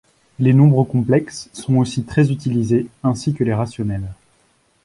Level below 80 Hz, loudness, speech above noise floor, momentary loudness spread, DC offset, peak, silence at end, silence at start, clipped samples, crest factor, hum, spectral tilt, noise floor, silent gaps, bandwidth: -46 dBFS; -18 LUFS; 43 dB; 12 LU; under 0.1%; -2 dBFS; 0.7 s; 0.4 s; under 0.1%; 16 dB; none; -7.5 dB/octave; -60 dBFS; none; 11.5 kHz